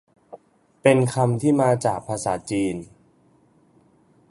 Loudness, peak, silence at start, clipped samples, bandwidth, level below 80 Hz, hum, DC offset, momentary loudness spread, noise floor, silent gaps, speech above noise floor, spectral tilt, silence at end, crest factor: -21 LUFS; -2 dBFS; 0.35 s; under 0.1%; 11.5 kHz; -58 dBFS; none; under 0.1%; 8 LU; -59 dBFS; none; 38 dB; -6.5 dB/octave; 1.45 s; 22 dB